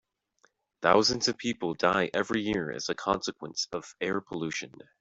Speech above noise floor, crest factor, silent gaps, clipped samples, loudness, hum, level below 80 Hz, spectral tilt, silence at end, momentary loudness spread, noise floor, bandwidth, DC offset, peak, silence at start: 40 dB; 24 dB; none; under 0.1%; -29 LUFS; none; -62 dBFS; -3.5 dB/octave; 0.35 s; 11 LU; -69 dBFS; 8 kHz; under 0.1%; -6 dBFS; 0.8 s